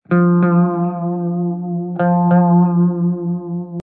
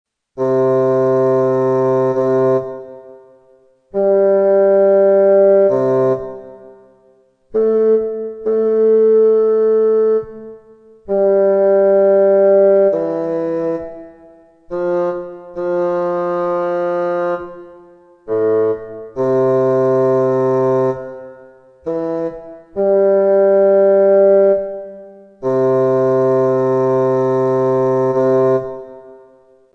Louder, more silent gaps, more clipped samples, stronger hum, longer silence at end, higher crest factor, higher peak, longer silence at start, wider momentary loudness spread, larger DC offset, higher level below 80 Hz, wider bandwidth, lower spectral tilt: about the same, -16 LUFS vs -14 LUFS; neither; neither; neither; second, 0.05 s vs 0.6 s; about the same, 12 dB vs 12 dB; about the same, -4 dBFS vs -2 dBFS; second, 0.1 s vs 0.35 s; second, 10 LU vs 14 LU; neither; second, -70 dBFS vs -56 dBFS; second, 2.6 kHz vs 6.2 kHz; first, -13.5 dB/octave vs -9.5 dB/octave